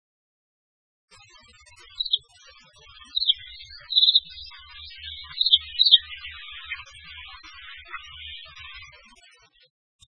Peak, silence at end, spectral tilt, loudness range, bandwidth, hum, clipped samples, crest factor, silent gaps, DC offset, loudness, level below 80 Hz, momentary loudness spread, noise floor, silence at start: 0 dBFS; 1.3 s; 0.5 dB/octave; 18 LU; 10 kHz; none; under 0.1%; 28 dB; none; under 0.1%; -20 LUFS; -58 dBFS; 25 LU; -56 dBFS; 2 s